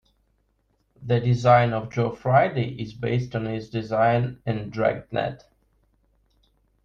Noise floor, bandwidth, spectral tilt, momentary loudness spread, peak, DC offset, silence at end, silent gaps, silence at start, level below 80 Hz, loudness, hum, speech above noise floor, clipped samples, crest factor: -69 dBFS; 7.2 kHz; -8 dB/octave; 12 LU; -4 dBFS; under 0.1%; 1.5 s; none; 1 s; -54 dBFS; -24 LUFS; none; 46 dB; under 0.1%; 20 dB